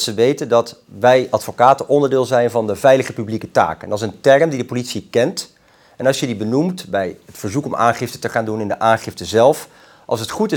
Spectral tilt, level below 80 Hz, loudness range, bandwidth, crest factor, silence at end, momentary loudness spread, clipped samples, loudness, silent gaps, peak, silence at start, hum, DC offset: -5 dB/octave; -60 dBFS; 5 LU; 19 kHz; 16 dB; 0 s; 10 LU; under 0.1%; -17 LUFS; none; 0 dBFS; 0 s; none; under 0.1%